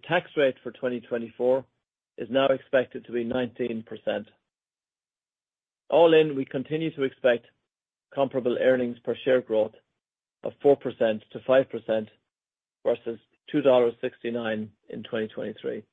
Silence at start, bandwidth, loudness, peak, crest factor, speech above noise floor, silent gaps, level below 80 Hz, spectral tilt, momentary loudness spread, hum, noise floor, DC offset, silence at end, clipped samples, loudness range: 0.05 s; 3.9 kHz; -26 LUFS; -8 dBFS; 20 dB; over 65 dB; none; -70 dBFS; -8 dB/octave; 12 LU; none; under -90 dBFS; under 0.1%; 0.1 s; under 0.1%; 4 LU